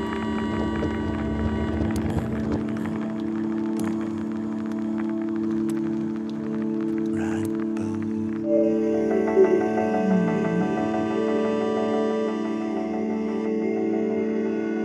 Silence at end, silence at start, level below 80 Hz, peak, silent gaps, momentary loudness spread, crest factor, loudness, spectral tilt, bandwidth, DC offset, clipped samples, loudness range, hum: 0 s; 0 s; -44 dBFS; -8 dBFS; none; 6 LU; 18 dB; -25 LUFS; -8 dB/octave; 12 kHz; under 0.1%; under 0.1%; 5 LU; none